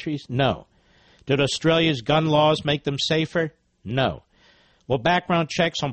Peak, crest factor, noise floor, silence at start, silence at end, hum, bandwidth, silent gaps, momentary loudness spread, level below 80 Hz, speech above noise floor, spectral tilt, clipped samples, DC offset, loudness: -6 dBFS; 16 dB; -57 dBFS; 0 s; 0 s; none; 8.4 kHz; none; 10 LU; -52 dBFS; 36 dB; -5.5 dB/octave; under 0.1%; under 0.1%; -22 LUFS